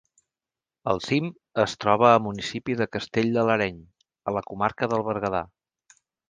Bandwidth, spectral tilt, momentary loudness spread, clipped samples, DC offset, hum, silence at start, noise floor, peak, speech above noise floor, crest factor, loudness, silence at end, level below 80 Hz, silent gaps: 9.6 kHz; -6 dB/octave; 11 LU; under 0.1%; under 0.1%; none; 0.85 s; under -90 dBFS; -4 dBFS; over 66 dB; 22 dB; -25 LUFS; 0.85 s; -58 dBFS; none